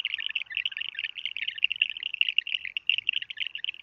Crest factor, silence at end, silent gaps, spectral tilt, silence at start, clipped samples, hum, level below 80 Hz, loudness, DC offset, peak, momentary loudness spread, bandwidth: 24 dB; 0.1 s; none; 1.5 dB/octave; 0 s; under 0.1%; none; -76 dBFS; -28 LUFS; under 0.1%; -6 dBFS; 7 LU; 6.6 kHz